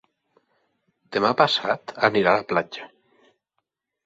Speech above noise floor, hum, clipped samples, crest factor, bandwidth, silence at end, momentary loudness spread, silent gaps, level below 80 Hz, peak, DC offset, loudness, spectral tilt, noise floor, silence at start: 57 dB; none; under 0.1%; 24 dB; 8 kHz; 1.2 s; 11 LU; none; -64 dBFS; -2 dBFS; under 0.1%; -21 LUFS; -5 dB/octave; -79 dBFS; 1.1 s